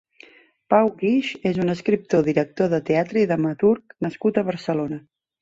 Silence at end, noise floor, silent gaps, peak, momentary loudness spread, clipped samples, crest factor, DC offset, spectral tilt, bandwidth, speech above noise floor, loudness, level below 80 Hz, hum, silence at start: 0.4 s; -51 dBFS; none; -4 dBFS; 6 LU; under 0.1%; 18 dB; under 0.1%; -7.5 dB/octave; 7.8 kHz; 30 dB; -22 LUFS; -62 dBFS; none; 0.7 s